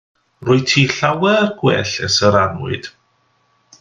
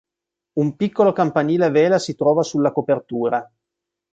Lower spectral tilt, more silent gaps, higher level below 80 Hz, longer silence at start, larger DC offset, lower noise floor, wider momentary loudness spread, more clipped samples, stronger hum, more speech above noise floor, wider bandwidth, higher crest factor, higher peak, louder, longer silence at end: second, -4.5 dB/octave vs -6.5 dB/octave; neither; first, -54 dBFS vs -64 dBFS; second, 0.4 s vs 0.55 s; neither; second, -61 dBFS vs -85 dBFS; first, 13 LU vs 7 LU; neither; neither; second, 45 dB vs 67 dB; about the same, 9.6 kHz vs 9 kHz; about the same, 18 dB vs 16 dB; first, 0 dBFS vs -4 dBFS; first, -15 LUFS vs -19 LUFS; first, 0.9 s vs 0.7 s